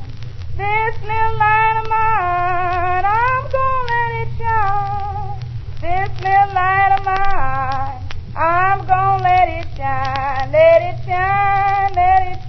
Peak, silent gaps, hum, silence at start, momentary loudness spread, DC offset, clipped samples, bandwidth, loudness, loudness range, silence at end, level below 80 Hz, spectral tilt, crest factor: -2 dBFS; none; none; 0 s; 11 LU; under 0.1%; under 0.1%; 6 kHz; -16 LUFS; 3 LU; 0 s; -28 dBFS; -4 dB/octave; 14 dB